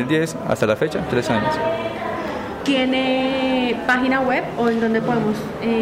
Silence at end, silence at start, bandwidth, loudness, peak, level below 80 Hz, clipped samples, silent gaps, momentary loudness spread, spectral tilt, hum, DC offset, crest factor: 0 s; 0 s; 16 kHz; -20 LUFS; -6 dBFS; -48 dBFS; under 0.1%; none; 7 LU; -5.5 dB/octave; none; under 0.1%; 14 dB